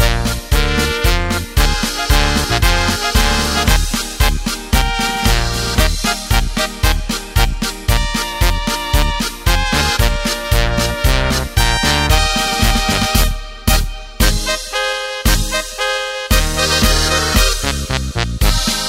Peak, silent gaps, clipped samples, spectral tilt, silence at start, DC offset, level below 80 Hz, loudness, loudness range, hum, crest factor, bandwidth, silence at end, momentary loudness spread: 0 dBFS; none; under 0.1%; -3.5 dB/octave; 0 s; under 0.1%; -18 dBFS; -16 LUFS; 2 LU; none; 14 dB; 16.5 kHz; 0 s; 5 LU